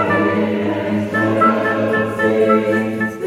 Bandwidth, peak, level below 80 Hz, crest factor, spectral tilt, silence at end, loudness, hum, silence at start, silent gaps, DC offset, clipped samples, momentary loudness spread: 15 kHz; -2 dBFS; -58 dBFS; 14 dB; -7 dB/octave; 0 s; -16 LUFS; none; 0 s; none; under 0.1%; under 0.1%; 5 LU